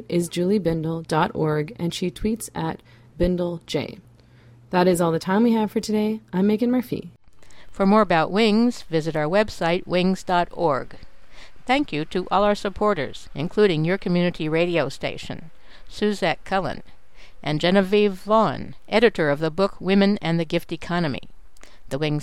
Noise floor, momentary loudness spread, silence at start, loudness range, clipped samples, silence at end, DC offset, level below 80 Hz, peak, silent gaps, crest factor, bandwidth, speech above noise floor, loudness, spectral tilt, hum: -50 dBFS; 11 LU; 0 s; 5 LU; under 0.1%; 0 s; under 0.1%; -44 dBFS; -4 dBFS; none; 20 dB; 15.5 kHz; 28 dB; -22 LUFS; -6 dB/octave; none